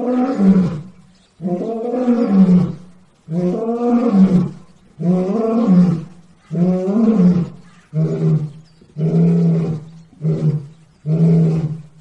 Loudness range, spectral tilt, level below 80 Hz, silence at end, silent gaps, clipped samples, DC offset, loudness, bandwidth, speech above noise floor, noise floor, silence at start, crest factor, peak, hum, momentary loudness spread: 3 LU; -10.5 dB/octave; -52 dBFS; 0.2 s; none; under 0.1%; under 0.1%; -16 LUFS; 6.4 kHz; 34 dB; -47 dBFS; 0 s; 14 dB; -2 dBFS; none; 13 LU